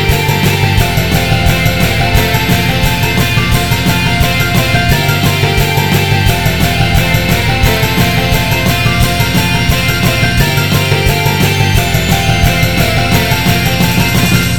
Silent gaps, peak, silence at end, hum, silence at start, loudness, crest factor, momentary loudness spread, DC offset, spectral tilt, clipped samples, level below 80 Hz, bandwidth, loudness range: none; 0 dBFS; 0 s; none; 0 s; -10 LUFS; 10 dB; 1 LU; 4%; -4.5 dB/octave; 0.1%; -20 dBFS; 19.5 kHz; 0 LU